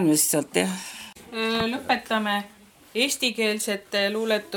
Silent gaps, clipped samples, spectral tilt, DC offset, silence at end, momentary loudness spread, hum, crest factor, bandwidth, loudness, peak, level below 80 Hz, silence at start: none; under 0.1%; -2.5 dB/octave; under 0.1%; 0 s; 12 LU; none; 22 dB; 19.5 kHz; -24 LUFS; -4 dBFS; -62 dBFS; 0 s